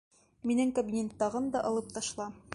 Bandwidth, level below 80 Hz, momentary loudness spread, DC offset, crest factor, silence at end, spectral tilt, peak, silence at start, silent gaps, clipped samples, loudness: 11.5 kHz; -64 dBFS; 8 LU; under 0.1%; 16 dB; 0 s; -4.5 dB/octave; -16 dBFS; 0.45 s; none; under 0.1%; -33 LUFS